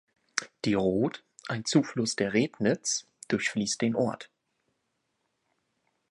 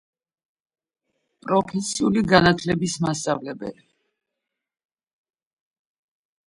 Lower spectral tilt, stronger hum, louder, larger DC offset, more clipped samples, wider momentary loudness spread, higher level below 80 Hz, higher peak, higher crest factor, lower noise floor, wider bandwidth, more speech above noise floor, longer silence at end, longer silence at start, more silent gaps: about the same, -4 dB/octave vs -5 dB/octave; neither; second, -29 LUFS vs -21 LUFS; neither; neither; second, 8 LU vs 17 LU; second, -64 dBFS vs -54 dBFS; second, -6 dBFS vs 0 dBFS; about the same, 24 dB vs 26 dB; second, -78 dBFS vs -83 dBFS; about the same, 11.5 kHz vs 11.5 kHz; second, 50 dB vs 62 dB; second, 1.85 s vs 2.75 s; second, 0.35 s vs 1.45 s; neither